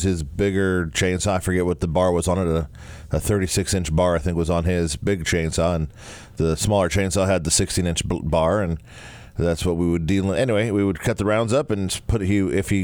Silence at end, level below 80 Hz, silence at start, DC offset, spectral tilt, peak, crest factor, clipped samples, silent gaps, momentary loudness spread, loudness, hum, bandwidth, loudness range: 0 s; -36 dBFS; 0 s; under 0.1%; -5 dB/octave; -6 dBFS; 16 dB; under 0.1%; none; 6 LU; -22 LUFS; none; 19.5 kHz; 1 LU